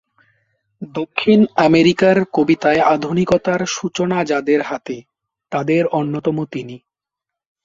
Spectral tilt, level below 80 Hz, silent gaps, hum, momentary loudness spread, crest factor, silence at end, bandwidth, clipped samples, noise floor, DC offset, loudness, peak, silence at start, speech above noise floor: -6 dB/octave; -54 dBFS; none; none; 14 LU; 16 dB; 0.85 s; 7.6 kHz; under 0.1%; -84 dBFS; under 0.1%; -16 LUFS; -2 dBFS; 0.8 s; 68 dB